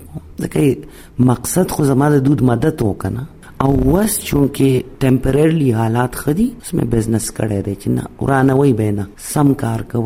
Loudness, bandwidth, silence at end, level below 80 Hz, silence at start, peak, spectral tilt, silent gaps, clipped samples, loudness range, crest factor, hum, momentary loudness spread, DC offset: -16 LUFS; 16.5 kHz; 0 s; -34 dBFS; 0 s; 0 dBFS; -6.5 dB/octave; none; under 0.1%; 2 LU; 16 dB; none; 8 LU; under 0.1%